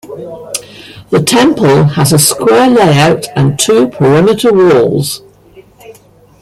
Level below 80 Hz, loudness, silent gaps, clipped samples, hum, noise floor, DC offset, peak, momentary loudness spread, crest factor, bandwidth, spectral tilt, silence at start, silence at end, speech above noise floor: -44 dBFS; -8 LUFS; none; under 0.1%; none; -41 dBFS; under 0.1%; 0 dBFS; 14 LU; 10 dB; 16 kHz; -5 dB/octave; 0.05 s; 0.5 s; 33 dB